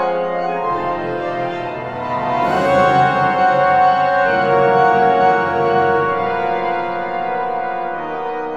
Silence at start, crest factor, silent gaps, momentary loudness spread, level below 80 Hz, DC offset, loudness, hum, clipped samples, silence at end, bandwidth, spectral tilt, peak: 0 s; 14 dB; none; 10 LU; -52 dBFS; under 0.1%; -16 LUFS; none; under 0.1%; 0 s; 8.2 kHz; -6.5 dB/octave; -2 dBFS